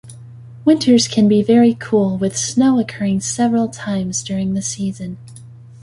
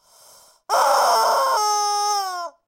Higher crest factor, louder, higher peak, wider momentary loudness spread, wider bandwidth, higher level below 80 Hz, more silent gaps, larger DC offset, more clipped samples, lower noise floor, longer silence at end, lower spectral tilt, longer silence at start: about the same, 14 dB vs 14 dB; first, -16 LUFS vs -19 LUFS; first, -2 dBFS vs -6 dBFS; first, 10 LU vs 7 LU; second, 11.5 kHz vs 16 kHz; first, -52 dBFS vs -82 dBFS; neither; neither; neither; second, -38 dBFS vs -51 dBFS; second, 0.05 s vs 0.2 s; first, -5 dB/octave vs 2 dB/octave; second, 0.05 s vs 0.7 s